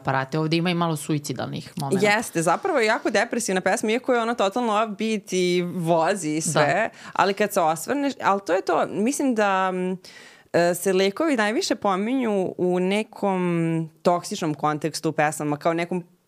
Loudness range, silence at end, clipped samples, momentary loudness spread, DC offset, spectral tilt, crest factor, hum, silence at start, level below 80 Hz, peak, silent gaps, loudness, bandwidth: 2 LU; 0.25 s; under 0.1%; 5 LU; under 0.1%; -4.5 dB/octave; 20 dB; none; 0 s; -70 dBFS; -4 dBFS; none; -23 LUFS; 16 kHz